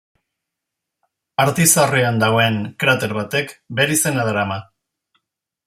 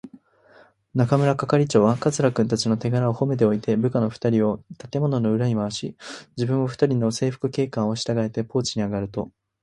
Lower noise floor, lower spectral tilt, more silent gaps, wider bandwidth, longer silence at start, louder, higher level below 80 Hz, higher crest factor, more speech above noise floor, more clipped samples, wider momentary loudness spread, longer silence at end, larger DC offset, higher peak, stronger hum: first, -81 dBFS vs -54 dBFS; second, -3.5 dB/octave vs -6.5 dB/octave; neither; first, 16 kHz vs 11.5 kHz; first, 1.4 s vs 0.05 s; first, -17 LUFS vs -23 LUFS; about the same, -58 dBFS vs -56 dBFS; about the same, 20 dB vs 20 dB; first, 64 dB vs 32 dB; neither; about the same, 11 LU vs 10 LU; first, 1.05 s vs 0.35 s; neither; first, 0 dBFS vs -4 dBFS; neither